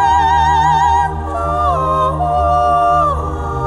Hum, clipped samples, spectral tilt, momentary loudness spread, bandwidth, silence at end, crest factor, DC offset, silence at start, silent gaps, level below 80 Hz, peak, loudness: none; under 0.1%; -6 dB/octave; 7 LU; 11.5 kHz; 0 s; 10 dB; under 0.1%; 0 s; none; -26 dBFS; -4 dBFS; -14 LUFS